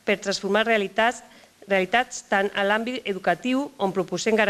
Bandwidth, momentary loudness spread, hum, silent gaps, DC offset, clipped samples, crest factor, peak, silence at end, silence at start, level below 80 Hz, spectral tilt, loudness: 14 kHz; 5 LU; none; none; under 0.1%; under 0.1%; 18 dB; -6 dBFS; 0 s; 0.05 s; -62 dBFS; -4 dB/octave; -24 LUFS